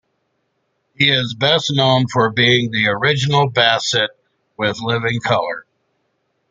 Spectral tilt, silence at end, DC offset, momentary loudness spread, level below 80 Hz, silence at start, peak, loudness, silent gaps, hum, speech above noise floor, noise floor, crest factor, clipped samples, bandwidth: -4.5 dB/octave; 0.9 s; under 0.1%; 8 LU; -56 dBFS; 1 s; 0 dBFS; -16 LUFS; none; none; 52 dB; -69 dBFS; 18 dB; under 0.1%; 9.2 kHz